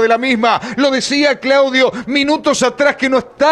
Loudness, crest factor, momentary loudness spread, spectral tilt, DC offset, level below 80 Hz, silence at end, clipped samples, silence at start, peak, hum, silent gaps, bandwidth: -13 LUFS; 12 dB; 3 LU; -3 dB/octave; under 0.1%; -52 dBFS; 0 s; under 0.1%; 0 s; -2 dBFS; none; none; 11.5 kHz